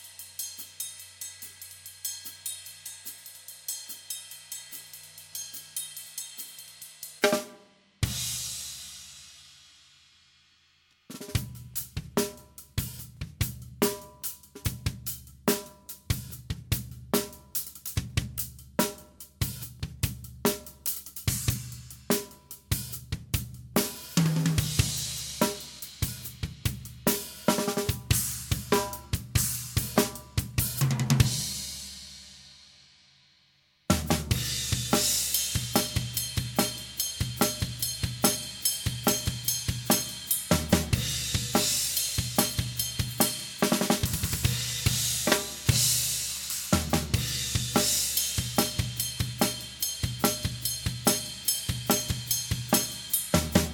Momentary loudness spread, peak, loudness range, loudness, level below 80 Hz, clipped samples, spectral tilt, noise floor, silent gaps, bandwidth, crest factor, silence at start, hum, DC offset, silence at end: 14 LU; -6 dBFS; 11 LU; -29 LUFS; -44 dBFS; under 0.1%; -3.5 dB/octave; -66 dBFS; none; 17.5 kHz; 24 dB; 0 s; none; under 0.1%; 0 s